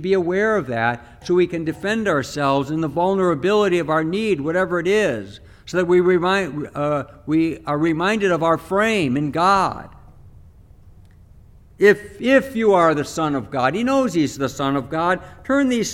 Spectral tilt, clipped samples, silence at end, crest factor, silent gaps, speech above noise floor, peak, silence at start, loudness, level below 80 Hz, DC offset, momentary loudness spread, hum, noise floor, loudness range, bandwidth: -5.5 dB/octave; under 0.1%; 0 s; 18 dB; none; 27 dB; -2 dBFS; 0 s; -19 LUFS; -50 dBFS; under 0.1%; 7 LU; none; -46 dBFS; 3 LU; 15 kHz